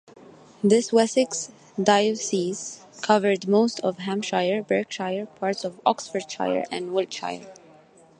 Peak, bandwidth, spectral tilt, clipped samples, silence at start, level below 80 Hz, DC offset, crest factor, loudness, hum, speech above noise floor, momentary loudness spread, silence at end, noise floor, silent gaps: -4 dBFS; 10.5 kHz; -4 dB/octave; under 0.1%; 0.65 s; -72 dBFS; under 0.1%; 20 dB; -24 LUFS; none; 29 dB; 11 LU; 0.65 s; -53 dBFS; none